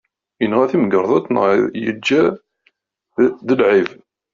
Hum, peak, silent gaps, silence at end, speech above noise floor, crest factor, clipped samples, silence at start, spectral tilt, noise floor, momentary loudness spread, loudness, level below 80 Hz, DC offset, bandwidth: none; -2 dBFS; none; 0.45 s; 47 dB; 16 dB; under 0.1%; 0.4 s; -4.5 dB/octave; -62 dBFS; 8 LU; -16 LUFS; -60 dBFS; under 0.1%; 7.4 kHz